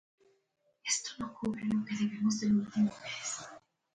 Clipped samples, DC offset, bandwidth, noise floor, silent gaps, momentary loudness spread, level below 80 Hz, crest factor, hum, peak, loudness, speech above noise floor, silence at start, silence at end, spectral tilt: under 0.1%; under 0.1%; 9.4 kHz; -76 dBFS; none; 11 LU; -70 dBFS; 18 dB; none; -18 dBFS; -34 LUFS; 43 dB; 0.85 s; 0.35 s; -4 dB/octave